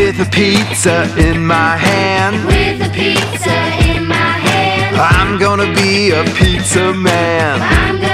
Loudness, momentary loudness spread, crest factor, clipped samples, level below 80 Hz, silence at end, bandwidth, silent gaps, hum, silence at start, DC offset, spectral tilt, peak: -11 LUFS; 3 LU; 12 dB; under 0.1%; -24 dBFS; 0 s; 15.5 kHz; none; none; 0 s; under 0.1%; -4.5 dB/octave; 0 dBFS